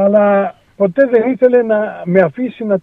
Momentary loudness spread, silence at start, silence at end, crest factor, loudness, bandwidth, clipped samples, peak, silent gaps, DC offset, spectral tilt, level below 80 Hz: 7 LU; 0 s; 0 s; 12 dB; -13 LUFS; 4.1 kHz; under 0.1%; 0 dBFS; none; under 0.1%; -10 dB/octave; -60 dBFS